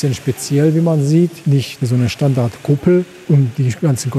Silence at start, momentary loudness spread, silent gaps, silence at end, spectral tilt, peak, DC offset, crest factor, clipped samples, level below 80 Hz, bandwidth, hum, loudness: 0 s; 4 LU; none; 0 s; -7 dB/octave; -2 dBFS; under 0.1%; 14 dB; under 0.1%; -50 dBFS; 14 kHz; none; -15 LUFS